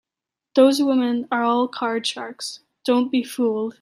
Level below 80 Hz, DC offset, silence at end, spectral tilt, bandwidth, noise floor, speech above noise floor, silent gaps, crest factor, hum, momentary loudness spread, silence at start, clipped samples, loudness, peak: -74 dBFS; under 0.1%; 0.1 s; -3.5 dB/octave; 15 kHz; -87 dBFS; 67 dB; none; 18 dB; none; 13 LU; 0.55 s; under 0.1%; -21 LUFS; -4 dBFS